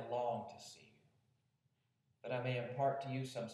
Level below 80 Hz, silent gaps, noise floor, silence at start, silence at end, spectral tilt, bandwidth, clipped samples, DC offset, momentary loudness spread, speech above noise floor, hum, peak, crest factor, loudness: -90 dBFS; none; -82 dBFS; 0 s; 0 s; -6 dB/octave; 12.5 kHz; under 0.1%; under 0.1%; 17 LU; 41 dB; none; -26 dBFS; 18 dB; -41 LUFS